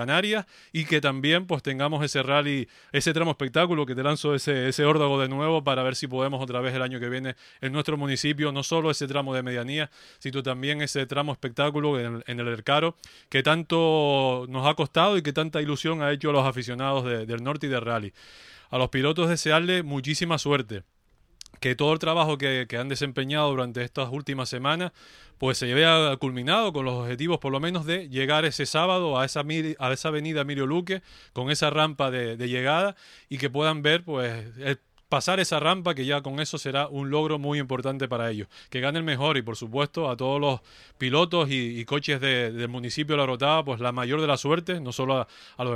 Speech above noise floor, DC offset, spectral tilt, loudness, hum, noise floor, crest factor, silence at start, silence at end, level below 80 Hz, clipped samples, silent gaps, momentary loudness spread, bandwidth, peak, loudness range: 27 dB; under 0.1%; -5 dB/octave; -26 LUFS; none; -52 dBFS; 20 dB; 0 s; 0 s; -62 dBFS; under 0.1%; none; 8 LU; 15 kHz; -6 dBFS; 4 LU